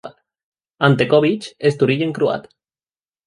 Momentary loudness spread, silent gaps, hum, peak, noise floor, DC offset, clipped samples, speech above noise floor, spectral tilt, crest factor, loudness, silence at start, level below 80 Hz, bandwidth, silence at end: 7 LU; 0.43-0.52 s; none; -2 dBFS; under -90 dBFS; under 0.1%; under 0.1%; over 73 dB; -7 dB/octave; 18 dB; -17 LUFS; 0.05 s; -60 dBFS; 11 kHz; 0.85 s